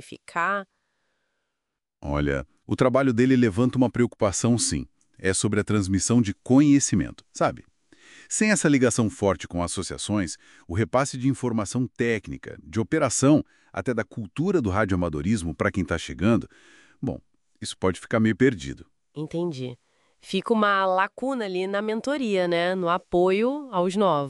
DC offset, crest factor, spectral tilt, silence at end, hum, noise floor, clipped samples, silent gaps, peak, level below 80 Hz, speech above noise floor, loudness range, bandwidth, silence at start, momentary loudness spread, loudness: under 0.1%; 18 dB; -5 dB/octave; 0 s; none; -84 dBFS; under 0.1%; none; -6 dBFS; -48 dBFS; 60 dB; 5 LU; 12 kHz; 0.05 s; 13 LU; -24 LUFS